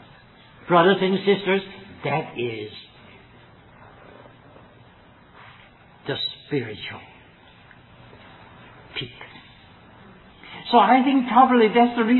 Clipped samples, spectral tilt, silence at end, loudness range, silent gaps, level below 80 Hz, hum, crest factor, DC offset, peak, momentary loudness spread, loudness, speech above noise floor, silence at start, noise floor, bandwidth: under 0.1%; -9 dB/octave; 0 s; 19 LU; none; -62 dBFS; none; 22 dB; under 0.1%; -2 dBFS; 23 LU; -20 LUFS; 31 dB; 0.65 s; -51 dBFS; 4.3 kHz